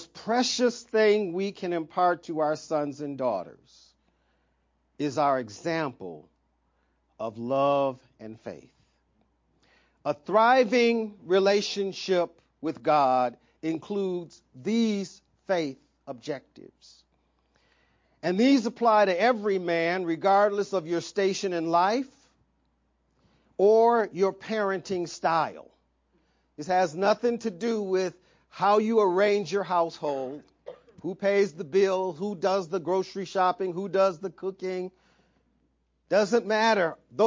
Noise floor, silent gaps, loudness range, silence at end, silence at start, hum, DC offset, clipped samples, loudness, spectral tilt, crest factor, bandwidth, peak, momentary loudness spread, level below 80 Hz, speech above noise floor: -71 dBFS; none; 8 LU; 0 s; 0 s; none; under 0.1%; under 0.1%; -26 LUFS; -5 dB/octave; 18 dB; 7.6 kHz; -10 dBFS; 14 LU; -72 dBFS; 46 dB